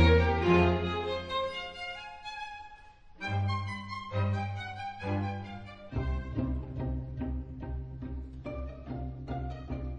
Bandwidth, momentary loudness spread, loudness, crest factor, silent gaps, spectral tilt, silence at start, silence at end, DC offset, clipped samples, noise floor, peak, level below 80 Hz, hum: 8.8 kHz; 16 LU; -34 LUFS; 20 dB; none; -7.5 dB/octave; 0 s; 0 s; under 0.1%; under 0.1%; -52 dBFS; -12 dBFS; -40 dBFS; none